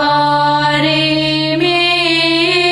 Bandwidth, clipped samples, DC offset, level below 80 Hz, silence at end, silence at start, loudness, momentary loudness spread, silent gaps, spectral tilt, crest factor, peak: 12 kHz; under 0.1%; under 0.1%; -46 dBFS; 0 s; 0 s; -12 LUFS; 2 LU; none; -4.5 dB/octave; 12 dB; 0 dBFS